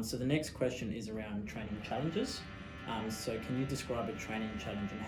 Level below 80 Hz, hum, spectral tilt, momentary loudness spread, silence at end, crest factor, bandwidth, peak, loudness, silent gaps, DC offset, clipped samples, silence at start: -56 dBFS; none; -5.5 dB/octave; 7 LU; 0 s; 18 dB; 19.5 kHz; -20 dBFS; -38 LUFS; none; under 0.1%; under 0.1%; 0 s